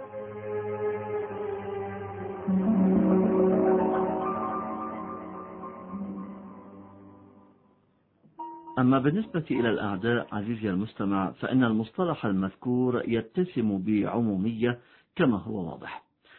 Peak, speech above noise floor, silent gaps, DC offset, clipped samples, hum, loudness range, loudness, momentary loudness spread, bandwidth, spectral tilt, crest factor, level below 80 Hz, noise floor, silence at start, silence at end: -10 dBFS; 40 dB; none; under 0.1%; under 0.1%; none; 12 LU; -28 LUFS; 17 LU; 4.2 kHz; -11.5 dB/octave; 18 dB; -60 dBFS; -67 dBFS; 0 s; 0.4 s